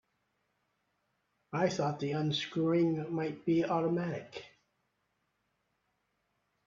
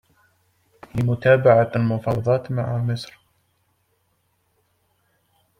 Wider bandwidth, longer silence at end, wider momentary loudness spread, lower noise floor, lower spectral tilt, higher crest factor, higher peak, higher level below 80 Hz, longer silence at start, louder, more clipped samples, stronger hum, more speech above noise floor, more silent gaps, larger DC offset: second, 7.6 kHz vs 10.5 kHz; second, 2.2 s vs 2.55 s; second, 11 LU vs 14 LU; first, -80 dBFS vs -68 dBFS; second, -6.5 dB/octave vs -8 dB/octave; about the same, 20 dB vs 20 dB; second, -16 dBFS vs -2 dBFS; second, -76 dBFS vs -54 dBFS; first, 1.5 s vs 0.95 s; second, -33 LUFS vs -20 LUFS; neither; neither; about the same, 48 dB vs 49 dB; neither; neither